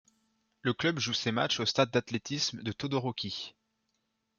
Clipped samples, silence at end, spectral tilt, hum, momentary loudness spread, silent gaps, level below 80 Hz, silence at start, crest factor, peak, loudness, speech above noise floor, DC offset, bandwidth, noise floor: under 0.1%; 0.9 s; -4 dB/octave; none; 9 LU; none; -70 dBFS; 0.65 s; 22 dB; -12 dBFS; -31 LUFS; 48 dB; under 0.1%; 7.4 kHz; -80 dBFS